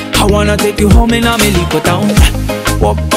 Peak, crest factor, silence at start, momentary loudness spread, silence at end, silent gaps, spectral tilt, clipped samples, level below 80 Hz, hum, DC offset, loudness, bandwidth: 0 dBFS; 10 dB; 0 s; 4 LU; 0 s; none; -5 dB/octave; 0.6%; -16 dBFS; none; under 0.1%; -10 LUFS; 16.5 kHz